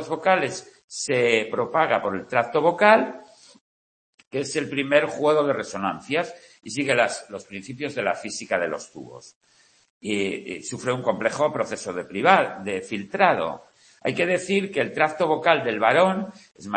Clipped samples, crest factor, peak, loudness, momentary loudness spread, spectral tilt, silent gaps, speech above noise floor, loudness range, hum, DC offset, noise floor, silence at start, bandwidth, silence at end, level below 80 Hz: under 0.1%; 22 dB; -2 dBFS; -23 LUFS; 15 LU; -4 dB/octave; 0.84-0.88 s, 3.61-4.18 s, 4.27-4.31 s, 9.36-9.41 s, 9.90-10.01 s; over 67 dB; 6 LU; none; under 0.1%; under -90 dBFS; 0 s; 8.8 kHz; 0 s; -68 dBFS